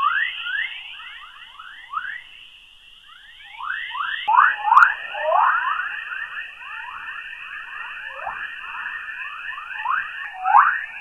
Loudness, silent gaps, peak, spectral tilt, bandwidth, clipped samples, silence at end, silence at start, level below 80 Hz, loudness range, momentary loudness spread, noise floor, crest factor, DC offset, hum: -22 LUFS; none; -2 dBFS; -0.5 dB/octave; 12.5 kHz; under 0.1%; 0 s; 0 s; -62 dBFS; 12 LU; 20 LU; -48 dBFS; 22 dB; under 0.1%; none